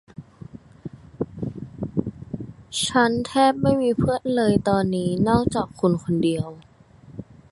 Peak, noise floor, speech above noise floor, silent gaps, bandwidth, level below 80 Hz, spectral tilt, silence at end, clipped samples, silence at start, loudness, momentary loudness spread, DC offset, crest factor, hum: -4 dBFS; -48 dBFS; 27 dB; none; 12 kHz; -46 dBFS; -6 dB/octave; 0.3 s; under 0.1%; 0.2 s; -22 LUFS; 22 LU; under 0.1%; 18 dB; none